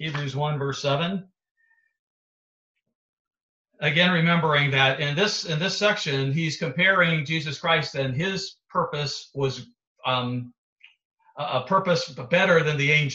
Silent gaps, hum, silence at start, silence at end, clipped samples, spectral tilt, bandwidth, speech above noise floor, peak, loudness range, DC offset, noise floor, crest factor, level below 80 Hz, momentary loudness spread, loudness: 1.51-1.55 s, 1.99-2.75 s, 2.95-3.31 s, 3.43-3.65 s, 9.87-9.95 s, 10.58-10.76 s, 11.05-11.18 s; none; 0 s; 0 s; under 0.1%; -5 dB/octave; 8 kHz; over 66 dB; -6 dBFS; 9 LU; under 0.1%; under -90 dBFS; 20 dB; -64 dBFS; 10 LU; -23 LUFS